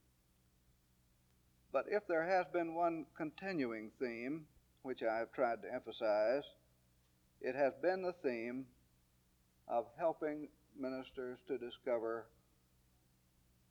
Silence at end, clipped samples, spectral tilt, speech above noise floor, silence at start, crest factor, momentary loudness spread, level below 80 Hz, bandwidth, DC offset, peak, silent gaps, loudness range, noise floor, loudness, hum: 1.45 s; under 0.1%; -6.5 dB/octave; 35 dB; 1.75 s; 18 dB; 12 LU; -78 dBFS; over 20 kHz; under 0.1%; -22 dBFS; none; 5 LU; -74 dBFS; -40 LUFS; none